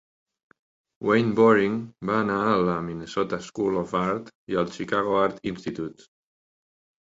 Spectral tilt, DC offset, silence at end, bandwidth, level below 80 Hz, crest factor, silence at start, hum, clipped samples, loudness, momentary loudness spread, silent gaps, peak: -6.5 dB/octave; under 0.1%; 1.1 s; 7.8 kHz; -58 dBFS; 20 dB; 1 s; none; under 0.1%; -25 LUFS; 13 LU; 4.35-4.47 s; -6 dBFS